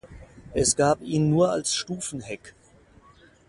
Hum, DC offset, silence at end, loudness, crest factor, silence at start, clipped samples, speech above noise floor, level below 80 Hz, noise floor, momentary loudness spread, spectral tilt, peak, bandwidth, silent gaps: none; under 0.1%; 1 s; -24 LUFS; 18 dB; 0.05 s; under 0.1%; 31 dB; -50 dBFS; -55 dBFS; 15 LU; -4.5 dB/octave; -8 dBFS; 11.5 kHz; none